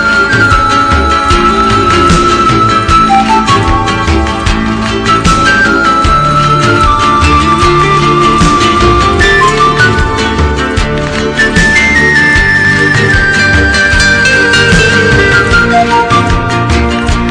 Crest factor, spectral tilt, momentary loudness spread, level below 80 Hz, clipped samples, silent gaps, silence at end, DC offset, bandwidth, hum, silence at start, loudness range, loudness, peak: 8 dB; -4.5 dB/octave; 5 LU; -18 dBFS; 0.6%; none; 0 s; under 0.1%; 11 kHz; none; 0 s; 2 LU; -7 LUFS; 0 dBFS